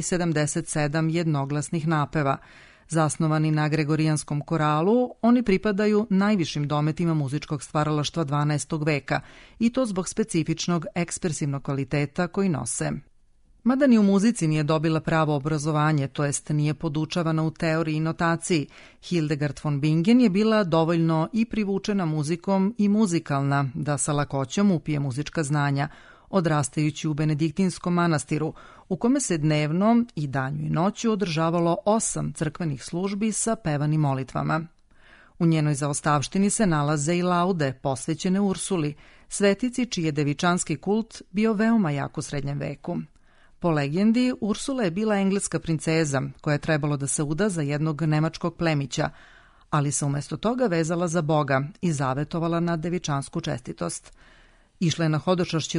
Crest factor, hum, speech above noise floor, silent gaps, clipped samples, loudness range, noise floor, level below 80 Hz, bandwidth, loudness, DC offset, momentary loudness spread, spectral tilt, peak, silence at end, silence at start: 18 dB; none; 33 dB; none; under 0.1%; 4 LU; -57 dBFS; -52 dBFS; 11 kHz; -25 LUFS; under 0.1%; 7 LU; -5.5 dB/octave; -6 dBFS; 0 s; 0 s